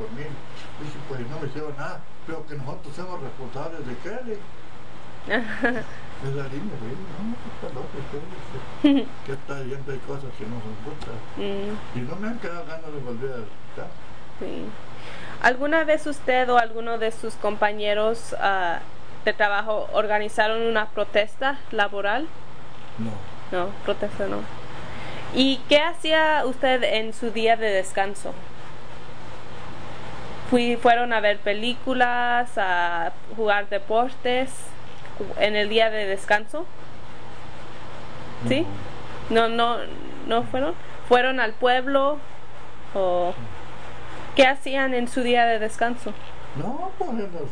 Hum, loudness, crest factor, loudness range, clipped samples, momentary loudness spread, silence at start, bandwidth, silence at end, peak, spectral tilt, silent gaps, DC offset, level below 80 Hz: none; -24 LUFS; 20 dB; 11 LU; under 0.1%; 20 LU; 0 s; 10 kHz; 0 s; -6 dBFS; -4.5 dB/octave; none; 6%; -52 dBFS